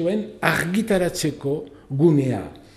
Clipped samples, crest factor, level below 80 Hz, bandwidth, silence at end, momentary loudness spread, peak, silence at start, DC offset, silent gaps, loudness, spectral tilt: under 0.1%; 22 dB; -50 dBFS; 15.5 kHz; 0.2 s; 11 LU; 0 dBFS; 0 s; under 0.1%; none; -22 LUFS; -6 dB/octave